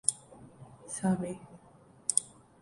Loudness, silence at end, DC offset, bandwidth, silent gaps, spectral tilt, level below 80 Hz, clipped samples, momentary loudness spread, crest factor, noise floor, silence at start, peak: -32 LUFS; 0.35 s; under 0.1%; 11.5 kHz; none; -4 dB/octave; -66 dBFS; under 0.1%; 24 LU; 30 dB; -59 dBFS; 0.05 s; -6 dBFS